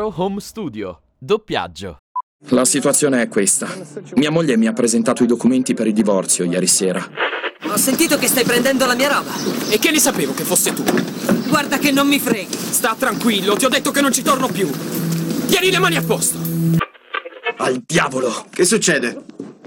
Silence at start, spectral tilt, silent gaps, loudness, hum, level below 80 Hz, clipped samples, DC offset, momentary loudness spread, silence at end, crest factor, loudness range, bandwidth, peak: 0 s; -3.5 dB/octave; 1.99-2.15 s, 2.23-2.39 s; -16 LUFS; none; -54 dBFS; under 0.1%; under 0.1%; 11 LU; 0.15 s; 14 dB; 2 LU; over 20 kHz; -4 dBFS